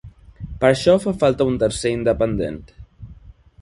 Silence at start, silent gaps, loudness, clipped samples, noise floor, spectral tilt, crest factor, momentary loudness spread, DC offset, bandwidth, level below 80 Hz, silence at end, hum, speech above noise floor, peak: 0.05 s; none; -19 LUFS; under 0.1%; -44 dBFS; -6 dB/octave; 20 dB; 17 LU; under 0.1%; 11.5 kHz; -40 dBFS; 0.3 s; none; 26 dB; 0 dBFS